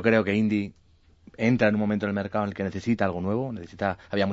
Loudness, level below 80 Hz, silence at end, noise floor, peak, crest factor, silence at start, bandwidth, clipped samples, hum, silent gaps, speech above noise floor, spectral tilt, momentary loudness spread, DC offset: -26 LUFS; -56 dBFS; 0 s; -55 dBFS; -6 dBFS; 20 dB; 0 s; 7.6 kHz; under 0.1%; none; none; 30 dB; -7.5 dB/octave; 8 LU; under 0.1%